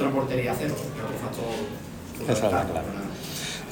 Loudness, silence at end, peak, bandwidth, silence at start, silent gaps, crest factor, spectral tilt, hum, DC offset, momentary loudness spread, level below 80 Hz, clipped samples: -29 LUFS; 0 s; -10 dBFS; 19 kHz; 0 s; none; 18 dB; -5 dB/octave; none; under 0.1%; 9 LU; -50 dBFS; under 0.1%